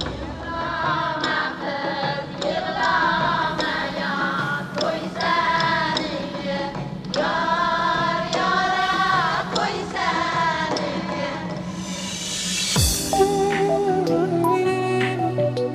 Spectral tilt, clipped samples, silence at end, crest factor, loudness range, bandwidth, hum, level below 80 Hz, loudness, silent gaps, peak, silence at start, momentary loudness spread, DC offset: -4 dB/octave; under 0.1%; 0 s; 16 dB; 3 LU; 15.5 kHz; none; -42 dBFS; -22 LUFS; none; -6 dBFS; 0 s; 8 LU; under 0.1%